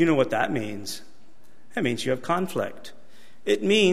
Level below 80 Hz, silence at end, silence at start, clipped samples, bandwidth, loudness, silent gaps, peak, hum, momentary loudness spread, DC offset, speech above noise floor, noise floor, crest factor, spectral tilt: -64 dBFS; 0 s; 0 s; under 0.1%; 15.5 kHz; -26 LUFS; none; -8 dBFS; none; 15 LU; 2%; 35 dB; -59 dBFS; 18 dB; -5 dB/octave